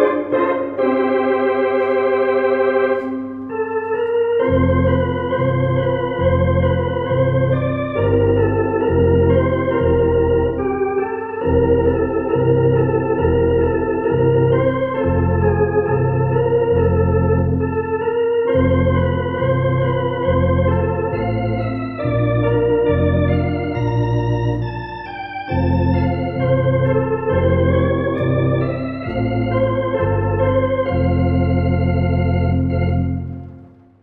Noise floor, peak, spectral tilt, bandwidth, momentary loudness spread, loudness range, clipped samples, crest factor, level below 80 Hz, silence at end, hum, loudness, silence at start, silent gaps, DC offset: -42 dBFS; -2 dBFS; -10.5 dB/octave; 5.6 kHz; 5 LU; 2 LU; under 0.1%; 14 dB; -34 dBFS; 0.35 s; none; -17 LUFS; 0 s; none; under 0.1%